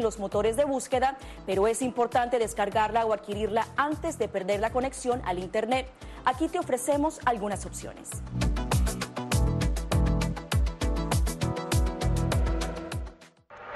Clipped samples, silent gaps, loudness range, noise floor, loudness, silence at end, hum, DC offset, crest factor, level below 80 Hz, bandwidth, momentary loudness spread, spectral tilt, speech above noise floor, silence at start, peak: under 0.1%; none; 2 LU; -51 dBFS; -28 LUFS; 0 s; none; under 0.1%; 18 dB; -34 dBFS; 12.5 kHz; 8 LU; -5.5 dB/octave; 23 dB; 0 s; -10 dBFS